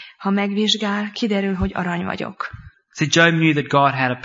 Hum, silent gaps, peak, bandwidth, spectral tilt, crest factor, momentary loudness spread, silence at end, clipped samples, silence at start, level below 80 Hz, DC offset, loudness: none; none; 0 dBFS; 7.8 kHz; -4.5 dB/octave; 20 dB; 13 LU; 0 s; under 0.1%; 0 s; -42 dBFS; under 0.1%; -19 LUFS